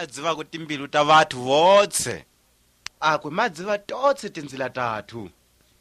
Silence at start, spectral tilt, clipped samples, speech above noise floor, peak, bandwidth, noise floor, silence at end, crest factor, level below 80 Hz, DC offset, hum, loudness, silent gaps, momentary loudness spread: 0 s; -3 dB/octave; under 0.1%; 40 dB; -4 dBFS; 14 kHz; -62 dBFS; 0.55 s; 20 dB; -62 dBFS; under 0.1%; none; -22 LUFS; none; 18 LU